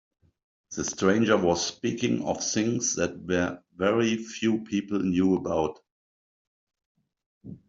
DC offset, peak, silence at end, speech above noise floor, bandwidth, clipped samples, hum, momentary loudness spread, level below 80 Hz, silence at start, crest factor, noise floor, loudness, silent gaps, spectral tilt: under 0.1%; -8 dBFS; 0.1 s; over 64 dB; 7.8 kHz; under 0.1%; none; 8 LU; -62 dBFS; 0.7 s; 20 dB; under -90 dBFS; -26 LUFS; 5.92-6.67 s, 6.86-6.95 s, 7.26-7.41 s; -4.5 dB/octave